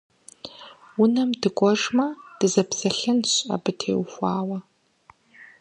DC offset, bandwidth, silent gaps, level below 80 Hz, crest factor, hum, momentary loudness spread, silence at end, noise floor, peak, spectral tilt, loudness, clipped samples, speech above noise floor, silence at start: under 0.1%; 11 kHz; none; -66 dBFS; 20 dB; none; 18 LU; 0.2 s; -57 dBFS; -4 dBFS; -4 dB/octave; -23 LUFS; under 0.1%; 34 dB; 0.45 s